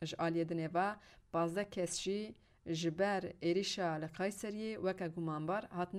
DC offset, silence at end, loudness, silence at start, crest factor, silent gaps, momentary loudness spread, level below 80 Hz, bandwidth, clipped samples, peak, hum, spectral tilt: under 0.1%; 0 s; -38 LUFS; 0 s; 18 dB; none; 7 LU; -70 dBFS; 15 kHz; under 0.1%; -20 dBFS; none; -5 dB/octave